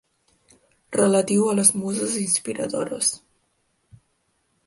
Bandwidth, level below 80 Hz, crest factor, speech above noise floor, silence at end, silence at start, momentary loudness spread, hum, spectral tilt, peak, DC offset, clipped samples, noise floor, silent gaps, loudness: 12 kHz; -66 dBFS; 24 dB; 48 dB; 1.5 s; 0.9 s; 10 LU; none; -3.5 dB/octave; -2 dBFS; under 0.1%; under 0.1%; -70 dBFS; none; -21 LUFS